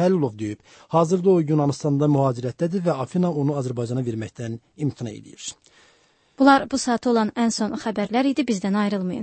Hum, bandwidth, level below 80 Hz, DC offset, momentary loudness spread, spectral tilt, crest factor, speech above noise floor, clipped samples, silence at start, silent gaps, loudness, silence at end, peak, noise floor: none; 8.8 kHz; -62 dBFS; under 0.1%; 14 LU; -6.5 dB/octave; 18 dB; 38 dB; under 0.1%; 0 s; none; -22 LUFS; 0 s; -4 dBFS; -60 dBFS